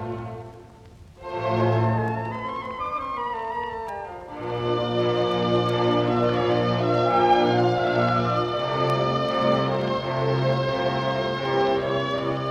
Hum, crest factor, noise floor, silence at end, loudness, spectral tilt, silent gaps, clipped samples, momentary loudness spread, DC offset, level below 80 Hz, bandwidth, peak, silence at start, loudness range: none; 16 dB; -47 dBFS; 0 s; -23 LUFS; -7.5 dB/octave; none; under 0.1%; 11 LU; under 0.1%; -52 dBFS; 8.4 kHz; -8 dBFS; 0 s; 6 LU